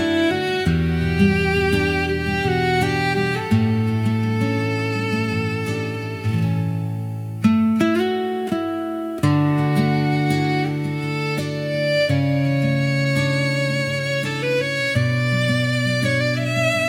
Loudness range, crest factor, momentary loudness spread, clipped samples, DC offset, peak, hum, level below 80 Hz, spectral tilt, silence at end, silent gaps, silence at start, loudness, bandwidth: 2 LU; 16 dB; 6 LU; under 0.1%; under 0.1%; -4 dBFS; none; -44 dBFS; -6.5 dB/octave; 0 s; none; 0 s; -20 LUFS; 16.5 kHz